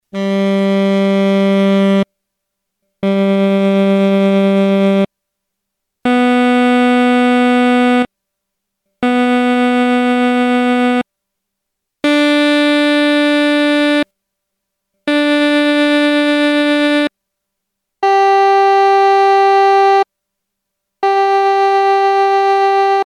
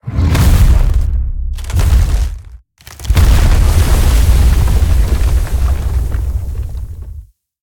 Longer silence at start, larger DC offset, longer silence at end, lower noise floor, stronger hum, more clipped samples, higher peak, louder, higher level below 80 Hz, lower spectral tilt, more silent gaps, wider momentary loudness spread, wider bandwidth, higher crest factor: about the same, 0.15 s vs 0.05 s; neither; second, 0 s vs 0.4 s; first, -76 dBFS vs -36 dBFS; neither; neither; second, -4 dBFS vs 0 dBFS; about the same, -12 LUFS vs -14 LUFS; second, -58 dBFS vs -12 dBFS; about the same, -6 dB/octave vs -5.5 dB/octave; neither; second, 7 LU vs 13 LU; second, 12.5 kHz vs 18 kHz; about the same, 10 dB vs 10 dB